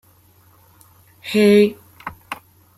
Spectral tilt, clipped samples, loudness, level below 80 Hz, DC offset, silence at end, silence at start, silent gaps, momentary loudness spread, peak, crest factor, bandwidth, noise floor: -6 dB/octave; under 0.1%; -15 LUFS; -60 dBFS; under 0.1%; 0.45 s; 1.25 s; none; 23 LU; -4 dBFS; 18 dB; 15 kHz; -53 dBFS